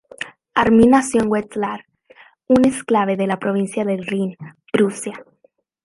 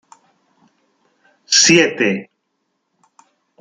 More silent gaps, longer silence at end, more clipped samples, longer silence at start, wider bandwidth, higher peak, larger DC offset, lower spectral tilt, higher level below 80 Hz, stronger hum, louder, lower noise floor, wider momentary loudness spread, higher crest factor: neither; second, 0.65 s vs 1.35 s; neither; second, 0.2 s vs 1.5 s; about the same, 11.5 kHz vs 11 kHz; about the same, -2 dBFS vs 0 dBFS; neither; first, -5.5 dB/octave vs -2 dB/octave; first, -50 dBFS vs -64 dBFS; neither; second, -18 LUFS vs -13 LUFS; second, -60 dBFS vs -71 dBFS; first, 18 LU vs 10 LU; about the same, 18 dB vs 20 dB